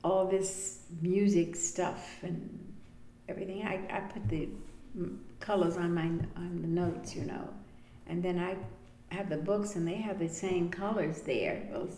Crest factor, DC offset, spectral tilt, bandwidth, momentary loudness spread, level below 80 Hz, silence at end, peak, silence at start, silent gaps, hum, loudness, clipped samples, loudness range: 16 dB; under 0.1%; -5.5 dB/octave; 11 kHz; 14 LU; -54 dBFS; 0 s; -18 dBFS; 0 s; none; none; -34 LUFS; under 0.1%; 4 LU